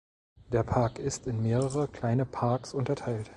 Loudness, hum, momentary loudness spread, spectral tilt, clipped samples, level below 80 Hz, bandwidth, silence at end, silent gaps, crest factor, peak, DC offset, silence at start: -30 LUFS; none; 4 LU; -7 dB/octave; under 0.1%; -52 dBFS; 11.5 kHz; 0 s; none; 20 dB; -10 dBFS; under 0.1%; 0.5 s